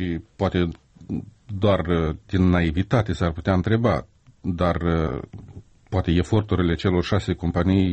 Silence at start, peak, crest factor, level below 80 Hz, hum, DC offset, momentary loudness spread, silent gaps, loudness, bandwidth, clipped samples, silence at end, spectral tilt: 0 s; -6 dBFS; 16 dB; -38 dBFS; none; under 0.1%; 12 LU; none; -23 LUFS; 8.4 kHz; under 0.1%; 0 s; -8 dB/octave